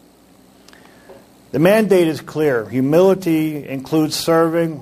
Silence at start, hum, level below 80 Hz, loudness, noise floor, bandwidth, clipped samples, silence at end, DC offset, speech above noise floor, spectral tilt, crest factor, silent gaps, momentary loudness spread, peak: 1.1 s; none; -56 dBFS; -16 LUFS; -49 dBFS; 15.5 kHz; under 0.1%; 0 s; under 0.1%; 33 dB; -6 dB/octave; 16 dB; none; 7 LU; -2 dBFS